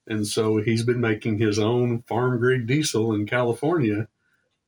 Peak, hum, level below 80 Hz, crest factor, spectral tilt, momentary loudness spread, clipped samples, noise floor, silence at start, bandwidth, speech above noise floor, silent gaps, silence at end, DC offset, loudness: -8 dBFS; none; -60 dBFS; 14 dB; -6 dB/octave; 3 LU; under 0.1%; -70 dBFS; 0.05 s; over 20 kHz; 47 dB; none; 0.6 s; under 0.1%; -23 LUFS